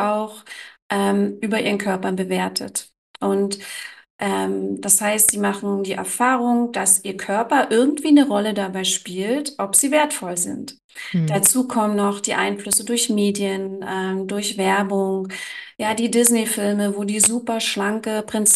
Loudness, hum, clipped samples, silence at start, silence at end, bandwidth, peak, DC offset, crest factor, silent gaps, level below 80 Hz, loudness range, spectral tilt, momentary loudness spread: -20 LUFS; none; under 0.1%; 0 s; 0 s; 13 kHz; -2 dBFS; under 0.1%; 20 dB; 0.82-0.90 s, 2.98-3.14 s, 4.10-4.19 s, 10.84-10.89 s; -64 dBFS; 5 LU; -3 dB/octave; 11 LU